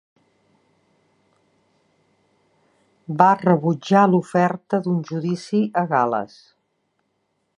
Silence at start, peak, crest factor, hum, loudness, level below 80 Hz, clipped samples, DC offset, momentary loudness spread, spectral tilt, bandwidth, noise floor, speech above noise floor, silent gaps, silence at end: 3.1 s; 0 dBFS; 22 dB; none; -20 LUFS; -70 dBFS; under 0.1%; under 0.1%; 10 LU; -7.5 dB/octave; 10.5 kHz; -71 dBFS; 52 dB; none; 1.35 s